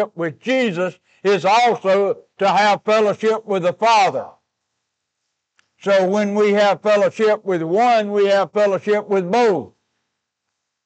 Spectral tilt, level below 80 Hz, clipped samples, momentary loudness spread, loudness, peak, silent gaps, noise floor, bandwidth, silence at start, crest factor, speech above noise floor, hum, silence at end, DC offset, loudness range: -5 dB/octave; -76 dBFS; under 0.1%; 7 LU; -17 LUFS; -8 dBFS; none; -77 dBFS; 8.8 kHz; 0 s; 10 dB; 61 dB; none; 1.2 s; under 0.1%; 3 LU